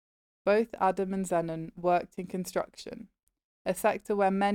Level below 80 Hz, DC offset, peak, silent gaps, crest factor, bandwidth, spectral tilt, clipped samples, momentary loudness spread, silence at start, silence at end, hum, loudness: -64 dBFS; under 0.1%; -14 dBFS; 3.23-3.27 s, 3.44-3.65 s; 16 dB; 18.5 kHz; -5.5 dB/octave; under 0.1%; 12 LU; 0.45 s; 0 s; none; -30 LUFS